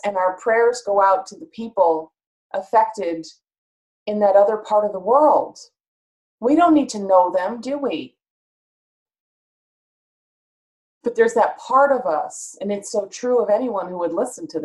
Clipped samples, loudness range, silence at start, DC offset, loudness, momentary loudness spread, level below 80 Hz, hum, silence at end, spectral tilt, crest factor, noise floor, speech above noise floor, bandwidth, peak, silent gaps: under 0.1%; 8 LU; 0.05 s; under 0.1%; -19 LUFS; 14 LU; -66 dBFS; none; 0 s; -4.5 dB/octave; 18 dB; under -90 dBFS; over 71 dB; 12 kHz; -4 dBFS; 2.26-2.50 s, 3.58-4.06 s, 5.88-6.38 s, 8.30-9.06 s, 9.20-11.01 s